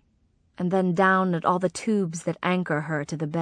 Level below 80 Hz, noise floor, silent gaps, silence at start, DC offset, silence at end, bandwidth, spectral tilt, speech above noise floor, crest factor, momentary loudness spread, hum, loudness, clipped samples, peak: -66 dBFS; -65 dBFS; none; 0.6 s; under 0.1%; 0 s; 10 kHz; -6 dB/octave; 41 dB; 18 dB; 9 LU; none; -25 LUFS; under 0.1%; -8 dBFS